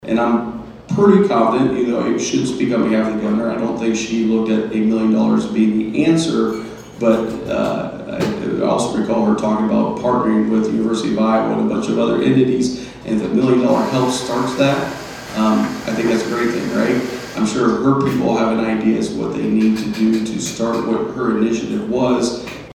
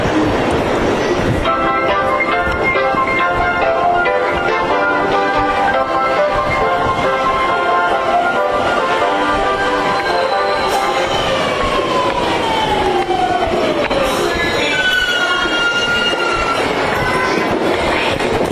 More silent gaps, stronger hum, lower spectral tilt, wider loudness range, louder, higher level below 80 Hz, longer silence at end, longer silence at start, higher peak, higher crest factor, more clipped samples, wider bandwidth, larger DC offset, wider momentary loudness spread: neither; neither; first, -6 dB/octave vs -4.5 dB/octave; about the same, 2 LU vs 1 LU; about the same, -17 LUFS vs -15 LUFS; second, -48 dBFS vs -34 dBFS; about the same, 0 s vs 0 s; about the same, 0 s vs 0 s; first, 0 dBFS vs -4 dBFS; about the same, 16 dB vs 12 dB; neither; second, 12.5 kHz vs 14 kHz; neither; first, 7 LU vs 2 LU